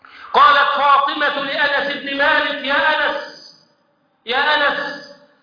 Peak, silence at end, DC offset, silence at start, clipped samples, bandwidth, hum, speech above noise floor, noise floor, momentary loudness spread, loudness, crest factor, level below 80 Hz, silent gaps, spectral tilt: 0 dBFS; 0.3 s; under 0.1%; 0.15 s; under 0.1%; 5.2 kHz; none; 44 dB; -62 dBFS; 15 LU; -16 LUFS; 16 dB; -58 dBFS; none; -3 dB/octave